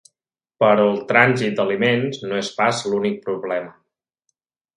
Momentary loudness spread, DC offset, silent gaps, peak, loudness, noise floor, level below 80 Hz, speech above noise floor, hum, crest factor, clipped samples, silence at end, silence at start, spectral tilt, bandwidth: 11 LU; under 0.1%; none; 0 dBFS; -19 LUFS; -85 dBFS; -66 dBFS; 66 dB; none; 20 dB; under 0.1%; 1.05 s; 0.6 s; -5 dB/octave; 11.5 kHz